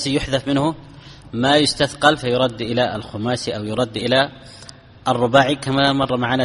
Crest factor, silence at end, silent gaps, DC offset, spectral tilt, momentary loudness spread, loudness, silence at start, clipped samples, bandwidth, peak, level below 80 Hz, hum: 20 dB; 0 s; none; under 0.1%; -5 dB/octave; 11 LU; -19 LUFS; 0 s; under 0.1%; 11.5 kHz; 0 dBFS; -46 dBFS; none